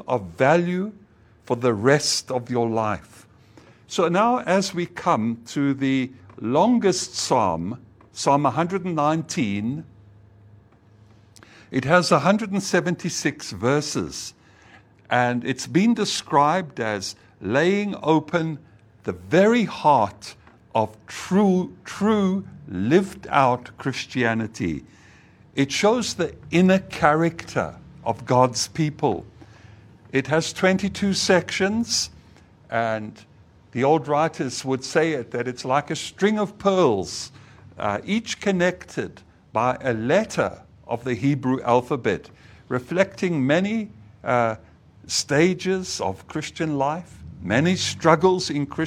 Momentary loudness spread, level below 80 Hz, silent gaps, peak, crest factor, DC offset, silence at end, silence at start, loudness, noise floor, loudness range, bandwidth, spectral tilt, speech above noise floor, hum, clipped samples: 12 LU; -56 dBFS; none; 0 dBFS; 22 dB; under 0.1%; 0 s; 0.1 s; -22 LUFS; -53 dBFS; 3 LU; 15 kHz; -5 dB/octave; 31 dB; none; under 0.1%